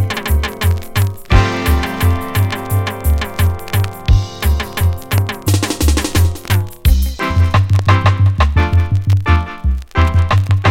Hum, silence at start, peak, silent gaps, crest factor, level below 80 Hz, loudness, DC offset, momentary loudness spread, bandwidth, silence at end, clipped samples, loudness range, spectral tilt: none; 0 s; 0 dBFS; none; 14 dB; -20 dBFS; -15 LUFS; under 0.1%; 5 LU; 17 kHz; 0 s; under 0.1%; 3 LU; -5.5 dB/octave